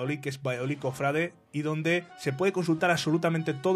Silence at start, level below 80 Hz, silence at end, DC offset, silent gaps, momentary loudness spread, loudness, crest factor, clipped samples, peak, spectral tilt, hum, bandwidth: 0 s; -68 dBFS; 0 s; under 0.1%; none; 7 LU; -29 LUFS; 18 dB; under 0.1%; -10 dBFS; -6 dB/octave; none; 14.5 kHz